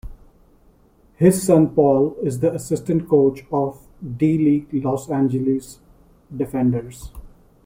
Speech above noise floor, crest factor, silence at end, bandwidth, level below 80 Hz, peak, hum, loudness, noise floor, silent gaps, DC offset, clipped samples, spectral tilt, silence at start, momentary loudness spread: 36 dB; 18 dB; 0.35 s; 16.5 kHz; -46 dBFS; -2 dBFS; none; -19 LUFS; -54 dBFS; none; under 0.1%; under 0.1%; -8 dB/octave; 0.05 s; 12 LU